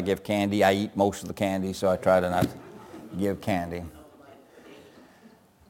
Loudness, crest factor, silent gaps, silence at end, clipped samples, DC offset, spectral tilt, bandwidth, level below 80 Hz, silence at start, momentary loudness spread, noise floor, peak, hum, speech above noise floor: -26 LUFS; 22 dB; none; 0.9 s; under 0.1%; under 0.1%; -6 dB/octave; 17 kHz; -56 dBFS; 0 s; 18 LU; -55 dBFS; -6 dBFS; none; 30 dB